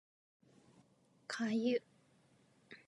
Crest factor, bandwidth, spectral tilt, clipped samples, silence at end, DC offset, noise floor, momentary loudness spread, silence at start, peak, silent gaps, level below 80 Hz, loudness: 18 dB; 11 kHz; -5 dB/octave; under 0.1%; 0.1 s; under 0.1%; -71 dBFS; 22 LU; 1.3 s; -24 dBFS; none; under -90 dBFS; -38 LUFS